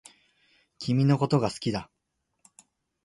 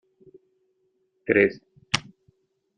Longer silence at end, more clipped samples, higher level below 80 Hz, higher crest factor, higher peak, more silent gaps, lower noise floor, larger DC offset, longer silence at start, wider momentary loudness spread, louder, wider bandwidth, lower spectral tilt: first, 1.2 s vs 0.75 s; neither; about the same, -60 dBFS vs -64 dBFS; second, 18 dB vs 28 dB; second, -10 dBFS vs 0 dBFS; neither; second, -66 dBFS vs -71 dBFS; neither; second, 0.8 s vs 1.3 s; second, 12 LU vs 19 LU; about the same, -26 LUFS vs -24 LUFS; first, 11.5 kHz vs 9.6 kHz; first, -7 dB/octave vs -4 dB/octave